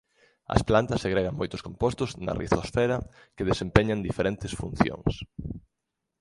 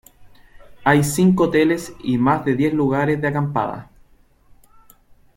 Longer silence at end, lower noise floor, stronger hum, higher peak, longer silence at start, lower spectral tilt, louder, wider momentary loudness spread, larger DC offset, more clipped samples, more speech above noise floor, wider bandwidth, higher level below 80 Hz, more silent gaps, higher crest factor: second, 0.6 s vs 1.55 s; first, -83 dBFS vs -53 dBFS; neither; about the same, 0 dBFS vs -2 dBFS; first, 0.5 s vs 0.2 s; about the same, -6.5 dB/octave vs -6.5 dB/octave; second, -27 LUFS vs -19 LUFS; first, 15 LU vs 8 LU; neither; neither; first, 56 dB vs 35 dB; second, 11.5 kHz vs 16.5 kHz; first, -42 dBFS vs -50 dBFS; neither; first, 28 dB vs 18 dB